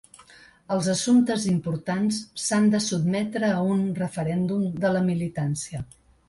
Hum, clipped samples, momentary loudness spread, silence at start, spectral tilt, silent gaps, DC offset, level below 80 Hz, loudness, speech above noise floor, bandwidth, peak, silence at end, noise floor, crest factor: none; under 0.1%; 8 LU; 0.7 s; -5.5 dB/octave; none; under 0.1%; -58 dBFS; -24 LUFS; 28 dB; 11.5 kHz; -10 dBFS; 0.45 s; -52 dBFS; 14 dB